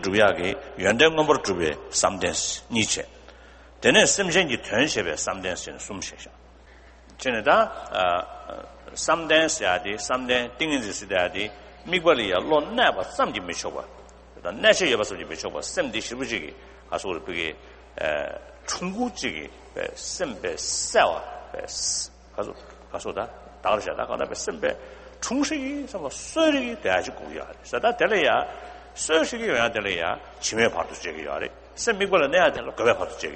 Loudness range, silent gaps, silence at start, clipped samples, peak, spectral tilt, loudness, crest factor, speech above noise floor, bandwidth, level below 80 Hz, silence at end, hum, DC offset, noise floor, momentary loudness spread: 7 LU; none; 0 s; under 0.1%; -2 dBFS; -2.5 dB/octave; -24 LUFS; 22 dB; 25 dB; 8.8 kHz; -50 dBFS; 0 s; none; under 0.1%; -49 dBFS; 15 LU